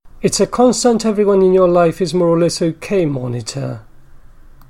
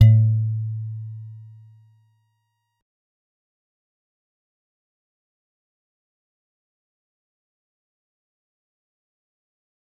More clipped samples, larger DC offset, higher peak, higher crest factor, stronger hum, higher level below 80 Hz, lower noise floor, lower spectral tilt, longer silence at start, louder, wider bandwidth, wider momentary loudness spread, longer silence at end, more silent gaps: neither; neither; about the same, -2 dBFS vs -2 dBFS; second, 14 dB vs 26 dB; neither; first, -42 dBFS vs -56 dBFS; second, -39 dBFS vs -74 dBFS; second, -5.5 dB/octave vs -9.5 dB/octave; about the same, 0.05 s vs 0 s; first, -15 LUFS vs -21 LUFS; first, 14 kHz vs 3.7 kHz; second, 12 LU vs 24 LU; second, 0.55 s vs 8.55 s; neither